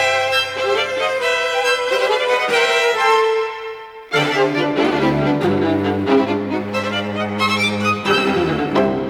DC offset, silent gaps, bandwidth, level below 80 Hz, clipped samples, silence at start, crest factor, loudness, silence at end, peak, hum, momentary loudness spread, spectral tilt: under 0.1%; none; 17.5 kHz; -50 dBFS; under 0.1%; 0 s; 14 dB; -17 LUFS; 0 s; -4 dBFS; none; 6 LU; -4.5 dB/octave